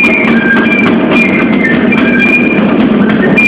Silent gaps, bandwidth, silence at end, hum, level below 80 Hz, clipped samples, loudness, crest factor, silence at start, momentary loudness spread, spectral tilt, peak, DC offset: none; 8.4 kHz; 0 s; none; -38 dBFS; 0.6%; -7 LUFS; 8 dB; 0 s; 2 LU; -7 dB/octave; 0 dBFS; under 0.1%